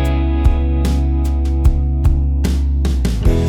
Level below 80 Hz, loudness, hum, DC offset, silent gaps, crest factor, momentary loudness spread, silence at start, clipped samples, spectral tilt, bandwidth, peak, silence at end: -14 dBFS; -17 LUFS; none; under 0.1%; none; 14 dB; 2 LU; 0 s; under 0.1%; -7.5 dB/octave; 12 kHz; 0 dBFS; 0 s